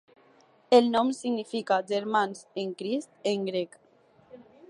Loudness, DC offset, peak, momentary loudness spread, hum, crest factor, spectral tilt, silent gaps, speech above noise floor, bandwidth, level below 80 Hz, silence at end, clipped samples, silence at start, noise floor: -27 LUFS; under 0.1%; -8 dBFS; 12 LU; none; 20 dB; -5 dB/octave; none; 34 dB; 11 kHz; -78 dBFS; 0.25 s; under 0.1%; 0.7 s; -61 dBFS